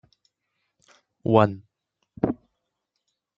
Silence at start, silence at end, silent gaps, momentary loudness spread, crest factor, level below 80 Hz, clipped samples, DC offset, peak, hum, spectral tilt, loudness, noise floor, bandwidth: 1.25 s; 1.05 s; none; 17 LU; 26 dB; -60 dBFS; under 0.1%; under 0.1%; -2 dBFS; none; -9 dB/octave; -24 LUFS; -80 dBFS; 7.4 kHz